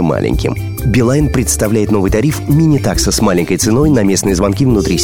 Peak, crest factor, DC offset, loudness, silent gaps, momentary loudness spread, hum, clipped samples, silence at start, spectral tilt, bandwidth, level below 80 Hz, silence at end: 0 dBFS; 12 dB; 0.9%; -12 LUFS; none; 4 LU; none; under 0.1%; 0 s; -5.5 dB/octave; 18.5 kHz; -24 dBFS; 0 s